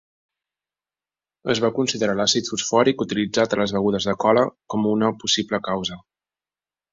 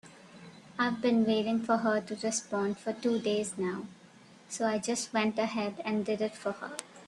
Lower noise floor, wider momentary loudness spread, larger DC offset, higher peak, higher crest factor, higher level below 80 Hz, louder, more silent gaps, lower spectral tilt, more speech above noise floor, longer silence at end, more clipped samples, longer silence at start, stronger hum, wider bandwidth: first, under -90 dBFS vs -56 dBFS; second, 6 LU vs 14 LU; neither; first, -4 dBFS vs -14 dBFS; about the same, 20 dB vs 18 dB; first, -58 dBFS vs -74 dBFS; first, -21 LUFS vs -31 LUFS; neither; about the same, -4 dB/octave vs -4 dB/octave; first, over 69 dB vs 25 dB; first, 0.95 s vs 0 s; neither; first, 1.45 s vs 0.05 s; first, 50 Hz at -45 dBFS vs none; second, 7.8 kHz vs 12 kHz